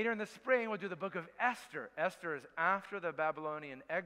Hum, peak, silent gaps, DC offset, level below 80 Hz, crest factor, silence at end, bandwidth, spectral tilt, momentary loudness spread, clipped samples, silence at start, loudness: none; -18 dBFS; none; under 0.1%; -82 dBFS; 20 dB; 0 s; 15 kHz; -5 dB/octave; 9 LU; under 0.1%; 0 s; -37 LUFS